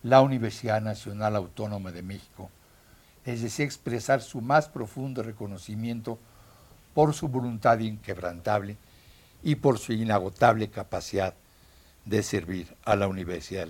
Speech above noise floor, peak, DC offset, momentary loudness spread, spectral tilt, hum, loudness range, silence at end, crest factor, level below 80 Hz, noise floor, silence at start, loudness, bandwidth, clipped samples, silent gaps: 30 dB; -4 dBFS; under 0.1%; 15 LU; -6 dB/octave; none; 5 LU; 0 s; 24 dB; -56 dBFS; -57 dBFS; 0.05 s; -28 LUFS; 17 kHz; under 0.1%; none